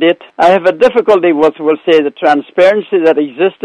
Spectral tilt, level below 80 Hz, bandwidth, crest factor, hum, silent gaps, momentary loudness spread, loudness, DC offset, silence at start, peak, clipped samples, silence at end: -6 dB/octave; -56 dBFS; 9.6 kHz; 10 dB; none; none; 4 LU; -10 LUFS; under 0.1%; 0 s; 0 dBFS; 0.7%; 0.15 s